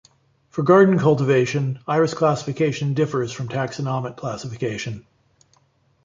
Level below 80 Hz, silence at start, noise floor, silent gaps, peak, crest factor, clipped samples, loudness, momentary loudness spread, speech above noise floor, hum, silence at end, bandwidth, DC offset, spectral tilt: -58 dBFS; 0.55 s; -62 dBFS; none; -2 dBFS; 18 dB; under 0.1%; -21 LUFS; 15 LU; 42 dB; none; 1.05 s; 7.6 kHz; under 0.1%; -7 dB/octave